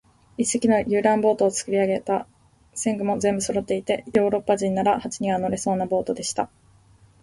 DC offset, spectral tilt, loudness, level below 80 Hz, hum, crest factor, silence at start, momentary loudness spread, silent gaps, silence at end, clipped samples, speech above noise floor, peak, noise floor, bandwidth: under 0.1%; -4.5 dB/octave; -23 LUFS; -56 dBFS; none; 18 dB; 0.4 s; 7 LU; none; 0.75 s; under 0.1%; 32 dB; -6 dBFS; -55 dBFS; 11.5 kHz